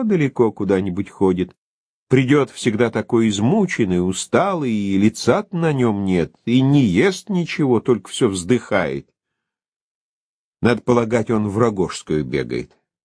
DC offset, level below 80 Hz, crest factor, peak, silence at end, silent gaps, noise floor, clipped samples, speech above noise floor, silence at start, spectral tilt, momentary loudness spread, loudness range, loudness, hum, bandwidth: under 0.1%; -50 dBFS; 18 dB; -2 dBFS; 0.4 s; 1.58-2.07 s, 9.68-10.53 s; -81 dBFS; under 0.1%; 63 dB; 0 s; -6 dB/octave; 7 LU; 4 LU; -19 LUFS; none; 11 kHz